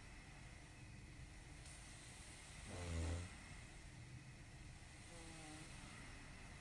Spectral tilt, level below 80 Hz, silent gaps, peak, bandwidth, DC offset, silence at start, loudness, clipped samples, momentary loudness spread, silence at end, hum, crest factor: -4.5 dB/octave; -62 dBFS; none; -34 dBFS; 11.5 kHz; under 0.1%; 0 s; -55 LUFS; under 0.1%; 11 LU; 0 s; none; 20 dB